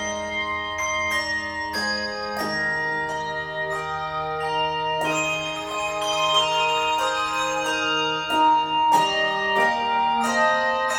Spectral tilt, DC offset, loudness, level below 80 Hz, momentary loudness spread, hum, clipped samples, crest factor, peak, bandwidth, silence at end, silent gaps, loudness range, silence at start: -2 dB/octave; under 0.1%; -22 LUFS; -54 dBFS; 8 LU; none; under 0.1%; 16 dB; -8 dBFS; 18 kHz; 0 s; none; 5 LU; 0 s